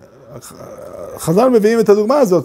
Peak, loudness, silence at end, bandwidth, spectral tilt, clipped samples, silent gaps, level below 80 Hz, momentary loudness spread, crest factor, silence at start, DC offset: 0 dBFS; -13 LUFS; 0 s; 16 kHz; -6.5 dB/octave; under 0.1%; none; -52 dBFS; 22 LU; 14 dB; 0.3 s; under 0.1%